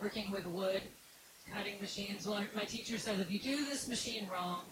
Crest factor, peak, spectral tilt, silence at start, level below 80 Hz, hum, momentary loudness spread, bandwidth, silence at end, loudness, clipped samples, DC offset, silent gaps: 16 dB; -24 dBFS; -3.5 dB/octave; 0 s; -68 dBFS; none; 8 LU; 16 kHz; 0 s; -39 LUFS; under 0.1%; under 0.1%; none